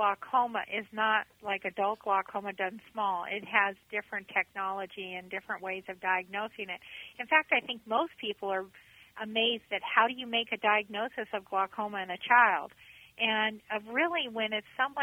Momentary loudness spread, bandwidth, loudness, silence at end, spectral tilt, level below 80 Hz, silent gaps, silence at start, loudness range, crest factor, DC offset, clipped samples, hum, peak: 11 LU; 19.5 kHz; -31 LUFS; 0 s; -4.5 dB/octave; -76 dBFS; none; 0 s; 4 LU; 24 dB; under 0.1%; under 0.1%; none; -8 dBFS